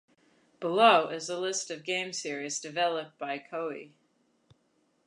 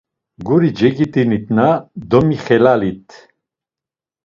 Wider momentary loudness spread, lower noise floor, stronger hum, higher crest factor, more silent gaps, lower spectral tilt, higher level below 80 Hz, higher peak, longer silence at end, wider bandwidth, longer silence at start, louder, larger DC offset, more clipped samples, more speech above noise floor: first, 15 LU vs 9 LU; second, -72 dBFS vs -89 dBFS; neither; first, 24 dB vs 16 dB; neither; second, -2.5 dB/octave vs -8.5 dB/octave; second, -86 dBFS vs -48 dBFS; second, -6 dBFS vs 0 dBFS; about the same, 1.2 s vs 1.25 s; first, 11 kHz vs 7.2 kHz; first, 0.6 s vs 0.4 s; second, -29 LUFS vs -15 LUFS; neither; neither; second, 42 dB vs 74 dB